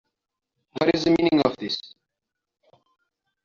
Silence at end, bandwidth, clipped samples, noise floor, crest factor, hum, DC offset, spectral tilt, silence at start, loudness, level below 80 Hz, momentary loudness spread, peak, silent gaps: 1.6 s; 7.2 kHz; under 0.1%; -84 dBFS; 22 dB; none; under 0.1%; -4 dB/octave; 0.75 s; -22 LUFS; -56 dBFS; 11 LU; -4 dBFS; none